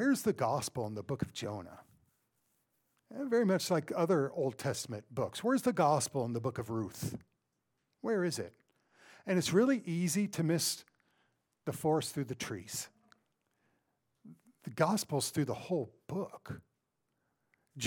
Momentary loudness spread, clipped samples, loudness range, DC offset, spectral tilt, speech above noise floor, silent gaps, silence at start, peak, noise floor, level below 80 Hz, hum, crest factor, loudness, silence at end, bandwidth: 14 LU; under 0.1%; 6 LU; under 0.1%; -5 dB/octave; 49 dB; none; 0 s; -16 dBFS; -83 dBFS; -72 dBFS; none; 20 dB; -34 LUFS; 0 s; 19 kHz